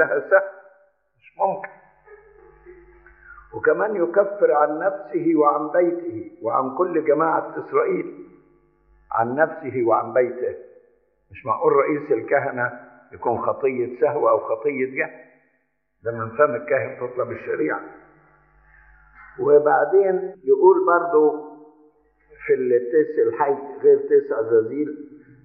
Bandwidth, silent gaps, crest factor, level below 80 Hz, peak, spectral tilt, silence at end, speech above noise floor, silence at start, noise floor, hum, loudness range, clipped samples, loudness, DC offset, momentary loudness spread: 2.8 kHz; none; 20 dB; -64 dBFS; -2 dBFS; -8.5 dB/octave; 0.3 s; 50 dB; 0 s; -70 dBFS; none; 7 LU; under 0.1%; -21 LUFS; under 0.1%; 12 LU